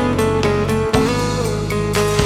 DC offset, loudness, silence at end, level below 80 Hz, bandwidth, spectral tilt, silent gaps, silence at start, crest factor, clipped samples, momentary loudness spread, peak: under 0.1%; -18 LUFS; 0 s; -32 dBFS; 16.5 kHz; -5.5 dB/octave; none; 0 s; 16 dB; under 0.1%; 3 LU; 0 dBFS